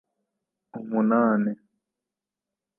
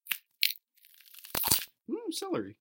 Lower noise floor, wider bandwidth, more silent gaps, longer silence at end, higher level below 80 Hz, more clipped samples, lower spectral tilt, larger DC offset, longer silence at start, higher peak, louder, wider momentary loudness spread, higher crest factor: first, -88 dBFS vs -61 dBFS; second, 2.9 kHz vs 17.5 kHz; neither; first, 1.25 s vs 0.1 s; second, -80 dBFS vs -62 dBFS; neither; first, -12.5 dB/octave vs -1.5 dB/octave; neither; first, 0.75 s vs 0.05 s; second, -12 dBFS vs -4 dBFS; first, -24 LUFS vs -31 LUFS; first, 19 LU vs 13 LU; second, 16 dB vs 30 dB